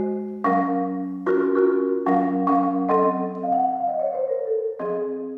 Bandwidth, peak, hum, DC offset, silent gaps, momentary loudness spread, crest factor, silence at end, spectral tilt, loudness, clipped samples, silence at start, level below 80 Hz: 4.7 kHz; -8 dBFS; none; under 0.1%; none; 7 LU; 14 dB; 0 s; -10 dB/octave; -23 LUFS; under 0.1%; 0 s; -66 dBFS